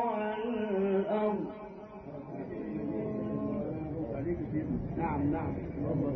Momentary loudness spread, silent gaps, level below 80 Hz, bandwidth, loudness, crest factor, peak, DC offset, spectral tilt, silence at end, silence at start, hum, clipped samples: 12 LU; none; -50 dBFS; 5.8 kHz; -34 LUFS; 14 dB; -18 dBFS; under 0.1%; -8 dB/octave; 0 s; 0 s; none; under 0.1%